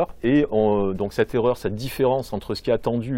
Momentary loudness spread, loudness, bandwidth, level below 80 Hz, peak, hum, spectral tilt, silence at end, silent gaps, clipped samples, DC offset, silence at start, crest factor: 7 LU; -22 LUFS; 16.5 kHz; -44 dBFS; -6 dBFS; none; -7 dB/octave; 0 s; none; under 0.1%; under 0.1%; 0 s; 16 dB